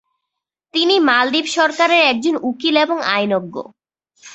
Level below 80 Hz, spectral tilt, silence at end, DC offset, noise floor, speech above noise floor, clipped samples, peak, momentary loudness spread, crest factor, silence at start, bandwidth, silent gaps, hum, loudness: -66 dBFS; -3 dB/octave; 0 s; under 0.1%; -81 dBFS; 65 dB; under 0.1%; -2 dBFS; 9 LU; 16 dB; 0.75 s; 8.2 kHz; none; none; -15 LUFS